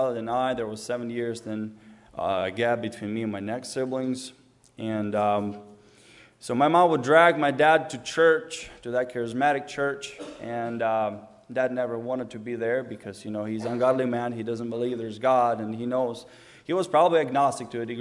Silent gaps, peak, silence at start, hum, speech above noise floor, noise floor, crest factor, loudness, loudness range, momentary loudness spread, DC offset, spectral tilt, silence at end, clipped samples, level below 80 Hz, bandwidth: none; -4 dBFS; 0 s; none; 28 dB; -54 dBFS; 22 dB; -26 LUFS; 8 LU; 14 LU; under 0.1%; -5.5 dB/octave; 0 s; under 0.1%; -66 dBFS; 11.5 kHz